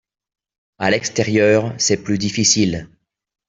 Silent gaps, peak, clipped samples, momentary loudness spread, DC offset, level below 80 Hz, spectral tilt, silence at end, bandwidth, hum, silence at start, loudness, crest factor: none; -2 dBFS; under 0.1%; 7 LU; under 0.1%; -52 dBFS; -3.5 dB/octave; 0.65 s; 7.8 kHz; none; 0.8 s; -17 LUFS; 16 dB